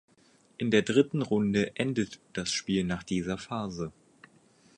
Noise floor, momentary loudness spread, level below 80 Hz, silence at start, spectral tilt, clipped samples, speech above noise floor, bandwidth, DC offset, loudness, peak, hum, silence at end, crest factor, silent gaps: -63 dBFS; 10 LU; -58 dBFS; 0.6 s; -5 dB/octave; under 0.1%; 34 dB; 11 kHz; under 0.1%; -30 LUFS; -10 dBFS; none; 0.9 s; 20 dB; none